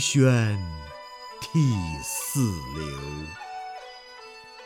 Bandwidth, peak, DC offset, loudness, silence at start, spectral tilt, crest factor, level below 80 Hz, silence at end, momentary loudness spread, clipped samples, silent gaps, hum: 18.5 kHz; -8 dBFS; under 0.1%; -27 LUFS; 0 s; -5 dB/octave; 20 dB; -48 dBFS; 0 s; 21 LU; under 0.1%; none; none